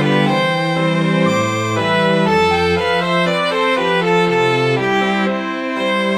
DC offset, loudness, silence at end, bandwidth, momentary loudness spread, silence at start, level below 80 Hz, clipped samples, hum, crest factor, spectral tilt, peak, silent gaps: 0.1%; -15 LUFS; 0 s; 15 kHz; 4 LU; 0 s; -48 dBFS; under 0.1%; none; 12 dB; -5.5 dB/octave; -2 dBFS; none